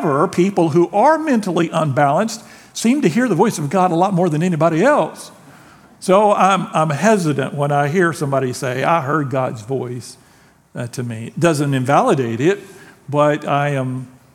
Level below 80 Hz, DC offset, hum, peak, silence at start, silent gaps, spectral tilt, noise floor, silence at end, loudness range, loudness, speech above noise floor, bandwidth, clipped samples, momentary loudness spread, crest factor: -62 dBFS; under 0.1%; none; 0 dBFS; 0 s; none; -6 dB/octave; -51 dBFS; 0.25 s; 4 LU; -17 LUFS; 34 dB; 16.5 kHz; under 0.1%; 12 LU; 16 dB